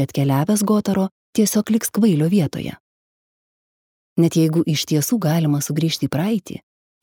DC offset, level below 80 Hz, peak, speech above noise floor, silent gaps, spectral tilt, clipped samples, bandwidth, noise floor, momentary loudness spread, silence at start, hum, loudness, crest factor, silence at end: under 0.1%; -60 dBFS; -4 dBFS; over 72 dB; 1.11-1.33 s, 2.80-4.16 s; -5.5 dB/octave; under 0.1%; 20 kHz; under -90 dBFS; 8 LU; 0 s; none; -19 LUFS; 16 dB; 0.45 s